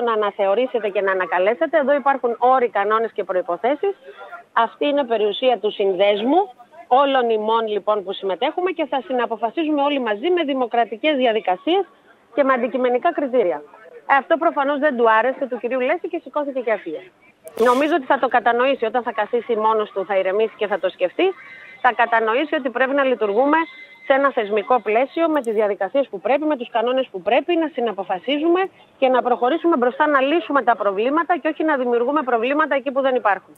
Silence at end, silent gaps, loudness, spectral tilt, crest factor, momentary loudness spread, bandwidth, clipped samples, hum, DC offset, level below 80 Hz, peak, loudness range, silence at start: 0.2 s; none; -19 LUFS; -5.5 dB/octave; 18 dB; 6 LU; 12 kHz; under 0.1%; none; under 0.1%; -76 dBFS; -2 dBFS; 2 LU; 0 s